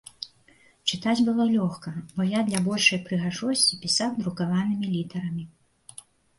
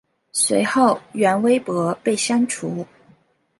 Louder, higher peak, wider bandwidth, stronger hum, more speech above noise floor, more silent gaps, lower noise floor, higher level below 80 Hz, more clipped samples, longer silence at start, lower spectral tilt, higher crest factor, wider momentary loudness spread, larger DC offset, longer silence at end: second, -25 LUFS vs -19 LUFS; about the same, -4 dBFS vs -2 dBFS; about the same, 11.5 kHz vs 12 kHz; neither; second, 33 dB vs 37 dB; neither; about the same, -59 dBFS vs -56 dBFS; about the same, -64 dBFS vs -68 dBFS; neither; second, 0.2 s vs 0.35 s; about the same, -4 dB/octave vs -4 dB/octave; about the same, 22 dB vs 18 dB; first, 19 LU vs 10 LU; neither; first, 0.9 s vs 0.75 s